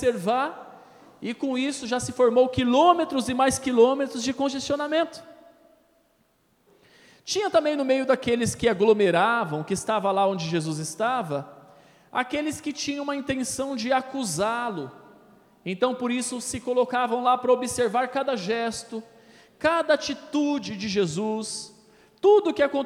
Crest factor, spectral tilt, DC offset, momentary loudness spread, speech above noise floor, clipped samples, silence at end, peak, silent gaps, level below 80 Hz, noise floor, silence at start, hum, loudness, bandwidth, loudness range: 22 dB; -4 dB/octave; under 0.1%; 12 LU; 42 dB; under 0.1%; 0 s; -4 dBFS; none; -58 dBFS; -66 dBFS; 0 s; none; -24 LUFS; 15.5 kHz; 7 LU